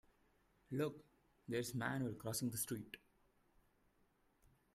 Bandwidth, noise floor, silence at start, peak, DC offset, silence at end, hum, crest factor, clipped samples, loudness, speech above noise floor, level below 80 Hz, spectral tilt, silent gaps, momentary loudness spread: 15.5 kHz; -77 dBFS; 0.7 s; -28 dBFS; under 0.1%; 1.75 s; none; 20 dB; under 0.1%; -44 LUFS; 34 dB; -74 dBFS; -4.5 dB/octave; none; 16 LU